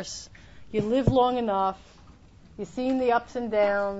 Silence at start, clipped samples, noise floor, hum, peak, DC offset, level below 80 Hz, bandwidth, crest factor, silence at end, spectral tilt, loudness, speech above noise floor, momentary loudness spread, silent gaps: 0 s; under 0.1%; -52 dBFS; none; -8 dBFS; under 0.1%; -48 dBFS; 8 kHz; 18 dB; 0 s; -6 dB/octave; -25 LUFS; 26 dB; 17 LU; none